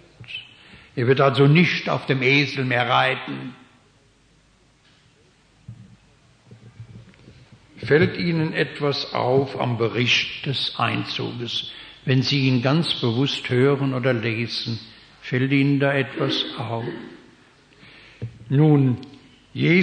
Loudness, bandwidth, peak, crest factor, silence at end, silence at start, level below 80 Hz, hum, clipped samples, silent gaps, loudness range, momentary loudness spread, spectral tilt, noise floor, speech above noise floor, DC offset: -21 LUFS; 9.6 kHz; -4 dBFS; 18 dB; 0 s; 0.2 s; -60 dBFS; none; under 0.1%; none; 6 LU; 17 LU; -6.5 dB/octave; -58 dBFS; 37 dB; under 0.1%